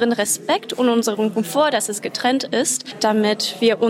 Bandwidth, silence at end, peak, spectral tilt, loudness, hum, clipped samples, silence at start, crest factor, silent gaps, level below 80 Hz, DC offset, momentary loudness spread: 16.5 kHz; 0 s; -6 dBFS; -3 dB/octave; -19 LUFS; none; under 0.1%; 0 s; 14 dB; none; -70 dBFS; under 0.1%; 3 LU